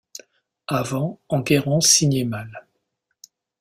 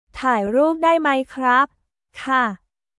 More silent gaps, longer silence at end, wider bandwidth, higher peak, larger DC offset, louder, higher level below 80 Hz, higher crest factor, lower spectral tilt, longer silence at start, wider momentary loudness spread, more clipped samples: neither; first, 1 s vs 0.45 s; first, 16 kHz vs 12 kHz; about the same, -4 dBFS vs -6 dBFS; neither; about the same, -19 LUFS vs -19 LUFS; about the same, -58 dBFS vs -54 dBFS; first, 20 dB vs 14 dB; second, -3.5 dB/octave vs -5 dB/octave; first, 0.7 s vs 0.15 s; first, 24 LU vs 8 LU; neither